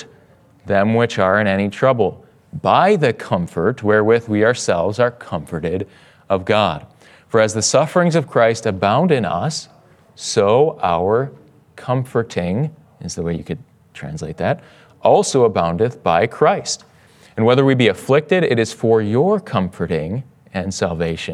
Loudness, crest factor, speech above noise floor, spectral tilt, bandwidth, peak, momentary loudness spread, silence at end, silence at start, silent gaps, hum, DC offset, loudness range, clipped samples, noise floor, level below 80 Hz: -17 LUFS; 16 dB; 33 dB; -5.5 dB/octave; 12.5 kHz; 0 dBFS; 12 LU; 0 s; 0 s; none; none; under 0.1%; 4 LU; under 0.1%; -50 dBFS; -54 dBFS